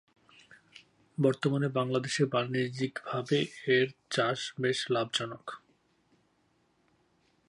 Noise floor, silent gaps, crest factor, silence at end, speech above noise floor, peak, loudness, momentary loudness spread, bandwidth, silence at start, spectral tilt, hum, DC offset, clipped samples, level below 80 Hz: -71 dBFS; none; 20 dB; 1.9 s; 41 dB; -14 dBFS; -30 LUFS; 9 LU; 11.5 kHz; 1.2 s; -5 dB/octave; none; under 0.1%; under 0.1%; -76 dBFS